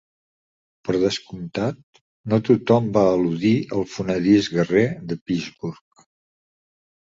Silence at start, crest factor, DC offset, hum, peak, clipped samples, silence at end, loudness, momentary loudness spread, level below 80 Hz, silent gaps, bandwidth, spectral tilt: 0.85 s; 20 dB; under 0.1%; none; -4 dBFS; under 0.1%; 1.3 s; -21 LUFS; 14 LU; -54 dBFS; 1.83-1.93 s, 2.01-2.24 s, 5.21-5.26 s; 7.8 kHz; -6.5 dB/octave